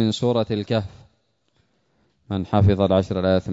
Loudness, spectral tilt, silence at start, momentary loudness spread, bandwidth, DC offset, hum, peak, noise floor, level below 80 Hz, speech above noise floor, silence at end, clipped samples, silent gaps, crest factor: -21 LUFS; -7.5 dB/octave; 0 s; 11 LU; 7.8 kHz; under 0.1%; none; -4 dBFS; -67 dBFS; -46 dBFS; 47 dB; 0 s; under 0.1%; none; 18 dB